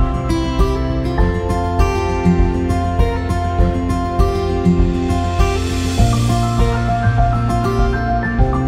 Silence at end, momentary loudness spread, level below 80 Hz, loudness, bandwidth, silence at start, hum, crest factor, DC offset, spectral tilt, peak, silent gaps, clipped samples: 0 s; 4 LU; -20 dBFS; -17 LUFS; 14.5 kHz; 0 s; none; 14 dB; under 0.1%; -7 dB/octave; -2 dBFS; none; under 0.1%